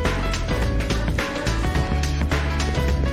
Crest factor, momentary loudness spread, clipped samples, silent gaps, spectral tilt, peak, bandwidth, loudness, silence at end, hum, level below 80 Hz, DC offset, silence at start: 12 dB; 2 LU; under 0.1%; none; -5.5 dB/octave; -10 dBFS; 15 kHz; -23 LUFS; 0 s; none; -24 dBFS; 0.5%; 0 s